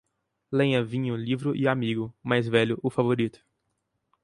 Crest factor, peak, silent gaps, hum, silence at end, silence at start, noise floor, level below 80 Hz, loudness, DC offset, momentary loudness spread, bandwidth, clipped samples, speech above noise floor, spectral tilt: 20 dB; -6 dBFS; none; none; 0.95 s; 0.5 s; -78 dBFS; -64 dBFS; -26 LUFS; under 0.1%; 6 LU; 11.5 kHz; under 0.1%; 52 dB; -7.5 dB/octave